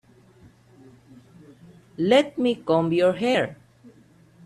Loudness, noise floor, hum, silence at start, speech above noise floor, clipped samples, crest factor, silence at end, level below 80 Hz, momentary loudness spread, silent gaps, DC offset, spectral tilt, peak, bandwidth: -22 LUFS; -54 dBFS; none; 2 s; 33 dB; under 0.1%; 20 dB; 0.9 s; -64 dBFS; 9 LU; none; under 0.1%; -6 dB/octave; -6 dBFS; 12.5 kHz